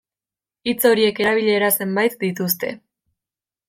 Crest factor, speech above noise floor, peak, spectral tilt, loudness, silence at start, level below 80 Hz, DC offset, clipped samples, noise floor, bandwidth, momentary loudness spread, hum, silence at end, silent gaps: 18 dB; over 71 dB; -2 dBFS; -4 dB/octave; -19 LUFS; 0.65 s; -64 dBFS; under 0.1%; under 0.1%; under -90 dBFS; 16.5 kHz; 9 LU; none; 0.9 s; none